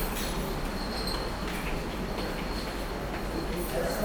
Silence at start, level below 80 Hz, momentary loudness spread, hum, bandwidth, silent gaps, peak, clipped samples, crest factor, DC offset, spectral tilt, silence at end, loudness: 0 s; -38 dBFS; 3 LU; none; over 20 kHz; none; -18 dBFS; under 0.1%; 14 dB; under 0.1%; -4.5 dB/octave; 0 s; -33 LUFS